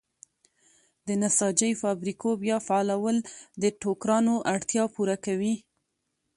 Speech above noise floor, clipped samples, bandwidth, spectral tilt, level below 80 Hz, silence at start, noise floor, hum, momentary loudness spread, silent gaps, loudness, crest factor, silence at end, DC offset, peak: 52 dB; under 0.1%; 11.5 kHz; -4.5 dB/octave; -70 dBFS; 1.05 s; -79 dBFS; none; 7 LU; none; -27 LUFS; 20 dB; 0.8 s; under 0.1%; -8 dBFS